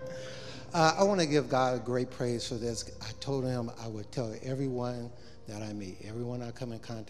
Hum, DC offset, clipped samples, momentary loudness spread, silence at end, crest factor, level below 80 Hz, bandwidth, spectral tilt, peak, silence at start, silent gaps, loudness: none; 0.4%; under 0.1%; 15 LU; 0 s; 24 dB; -58 dBFS; 13.5 kHz; -5 dB/octave; -8 dBFS; 0 s; none; -33 LUFS